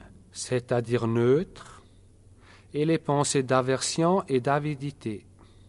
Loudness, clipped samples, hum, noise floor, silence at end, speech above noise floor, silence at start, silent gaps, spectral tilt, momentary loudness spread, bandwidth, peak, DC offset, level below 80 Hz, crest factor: -26 LUFS; under 0.1%; none; -54 dBFS; 0.5 s; 29 dB; 0 s; none; -5.5 dB/octave; 14 LU; 11.5 kHz; -8 dBFS; under 0.1%; -58 dBFS; 20 dB